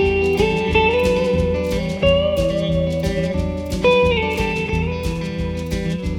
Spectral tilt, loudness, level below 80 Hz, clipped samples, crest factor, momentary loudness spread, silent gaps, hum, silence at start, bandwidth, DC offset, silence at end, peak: -6 dB/octave; -19 LUFS; -30 dBFS; under 0.1%; 16 dB; 8 LU; none; none; 0 s; 17 kHz; under 0.1%; 0 s; -2 dBFS